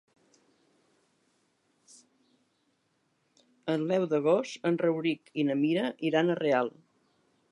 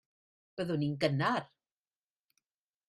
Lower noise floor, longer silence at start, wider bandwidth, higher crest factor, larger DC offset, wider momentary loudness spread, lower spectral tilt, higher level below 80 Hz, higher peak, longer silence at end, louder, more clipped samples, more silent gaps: second, -74 dBFS vs under -90 dBFS; first, 3.65 s vs 0.55 s; about the same, 11 kHz vs 12 kHz; about the same, 20 dB vs 22 dB; neither; second, 6 LU vs 10 LU; about the same, -6.5 dB/octave vs -7 dB/octave; second, -84 dBFS vs -72 dBFS; about the same, -12 dBFS vs -14 dBFS; second, 0.85 s vs 1.45 s; first, -29 LUFS vs -33 LUFS; neither; neither